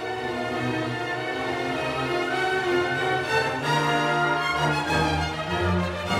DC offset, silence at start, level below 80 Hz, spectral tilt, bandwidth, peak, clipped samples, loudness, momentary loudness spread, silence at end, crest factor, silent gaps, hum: under 0.1%; 0 s; -46 dBFS; -5 dB/octave; 16 kHz; -10 dBFS; under 0.1%; -25 LUFS; 5 LU; 0 s; 16 dB; none; none